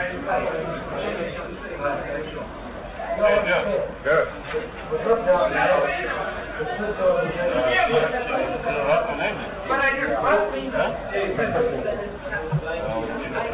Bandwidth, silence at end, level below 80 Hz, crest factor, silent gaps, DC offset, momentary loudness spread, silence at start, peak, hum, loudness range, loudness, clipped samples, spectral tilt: 4 kHz; 0 s; -44 dBFS; 18 dB; none; under 0.1%; 10 LU; 0 s; -6 dBFS; none; 4 LU; -23 LUFS; under 0.1%; -9 dB/octave